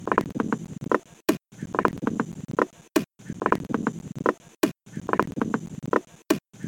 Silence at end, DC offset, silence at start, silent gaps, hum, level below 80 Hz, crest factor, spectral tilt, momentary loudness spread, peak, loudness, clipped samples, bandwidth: 0 s; under 0.1%; 0 s; none; none; -56 dBFS; 26 dB; -5.5 dB/octave; 6 LU; 0 dBFS; -28 LUFS; under 0.1%; 17.5 kHz